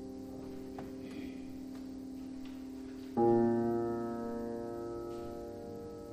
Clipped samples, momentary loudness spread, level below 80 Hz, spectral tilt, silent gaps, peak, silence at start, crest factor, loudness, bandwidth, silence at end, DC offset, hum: under 0.1%; 16 LU; -62 dBFS; -8 dB/octave; none; -18 dBFS; 0 s; 20 dB; -38 LUFS; 15 kHz; 0 s; under 0.1%; none